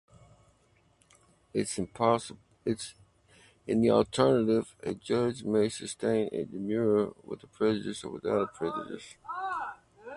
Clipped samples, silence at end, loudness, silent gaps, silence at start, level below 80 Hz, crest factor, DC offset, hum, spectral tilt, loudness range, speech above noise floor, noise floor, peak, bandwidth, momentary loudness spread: under 0.1%; 0 s; -30 LUFS; none; 1.55 s; -62 dBFS; 22 dB; under 0.1%; none; -5.5 dB/octave; 6 LU; 37 dB; -67 dBFS; -10 dBFS; 11.5 kHz; 16 LU